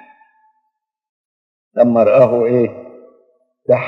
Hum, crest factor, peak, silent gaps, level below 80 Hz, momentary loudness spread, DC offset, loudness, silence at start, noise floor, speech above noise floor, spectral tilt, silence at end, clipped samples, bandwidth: none; 16 dB; 0 dBFS; none; -66 dBFS; 17 LU; under 0.1%; -13 LUFS; 1.75 s; -72 dBFS; 60 dB; -10 dB/octave; 0 s; under 0.1%; 5.6 kHz